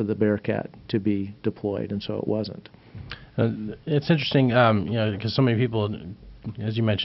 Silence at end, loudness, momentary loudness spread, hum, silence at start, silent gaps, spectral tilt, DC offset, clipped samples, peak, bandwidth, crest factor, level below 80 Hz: 0 s; -25 LUFS; 18 LU; none; 0 s; none; -5.5 dB/octave; under 0.1%; under 0.1%; -6 dBFS; 5.8 kHz; 18 dB; -54 dBFS